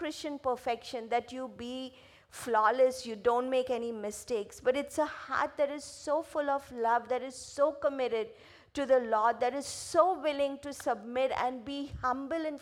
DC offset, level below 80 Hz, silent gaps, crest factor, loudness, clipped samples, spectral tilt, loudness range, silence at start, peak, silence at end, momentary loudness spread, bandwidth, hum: under 0.1%; -64 dBFS; none; 20 dB; -32 LUFS; under 0.1%; -3.5 dB/octave; 2 LU; 0 s; -12 dBFS; 0 s; 12 LU; 15.5 kHz; none